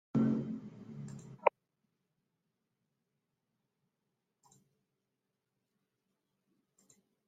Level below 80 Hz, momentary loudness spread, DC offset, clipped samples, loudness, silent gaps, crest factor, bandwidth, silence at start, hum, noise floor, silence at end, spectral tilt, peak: -78 dBFS; 17 LU; under 0.1%; under 0.1%; -36 LUFS; none; 32 dB; 9 kHz; 0.15 s; none; -87 dBFS; 5.8 s; -8.5 dB/octave; -10 dBFS